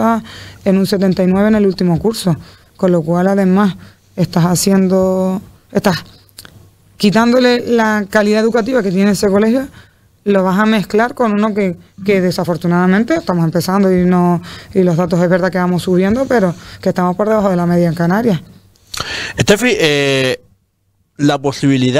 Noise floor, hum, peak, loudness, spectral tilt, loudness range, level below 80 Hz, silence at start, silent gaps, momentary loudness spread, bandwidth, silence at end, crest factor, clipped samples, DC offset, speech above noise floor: -61 dBFS; none; 0 dBFS; -14 LUFS; -6 dB/octave; 2 LU; -44 dBFS; 0 s; none; 8 LU; 15.5 kHz; 0 s; 14 dB; under 0.1%; under 0.1%; 48 dB